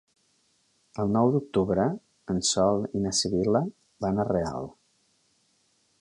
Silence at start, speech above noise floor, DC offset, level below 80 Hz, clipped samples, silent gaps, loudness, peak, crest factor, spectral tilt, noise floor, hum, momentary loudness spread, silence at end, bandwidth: 0.95 s; 43 dB; under 0.1%; -54 dBFS; under 0.1%; none; -26 LUFS; -10 dBFS; 18 dB; -5 dB/octave; -69 dBFS; none; 13 LU; 1.3 s; 11.5 kHz